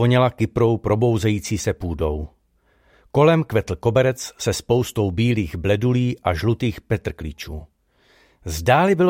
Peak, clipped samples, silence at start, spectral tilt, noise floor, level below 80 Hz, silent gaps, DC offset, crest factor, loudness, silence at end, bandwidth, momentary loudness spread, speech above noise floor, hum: -4 dBFS; under 0.1%; 0 s; -6.5 dB/octave; -61 dBFS; -40 dBFS; none; under 0.1%; 16 dB; -21 LUFS; 0 s; 16.5 kHz; 14 LU; 42 dB; none